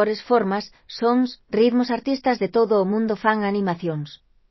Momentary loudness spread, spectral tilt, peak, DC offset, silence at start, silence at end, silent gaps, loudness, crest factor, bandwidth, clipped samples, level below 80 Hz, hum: 9 LU; -7 dB/octave; -4 dBFS; under 0.1%; 0 s; 0.35 s; none; -22 LUFS; 16 dB; 6 kHz; under 0.1%; -60 dBFS; none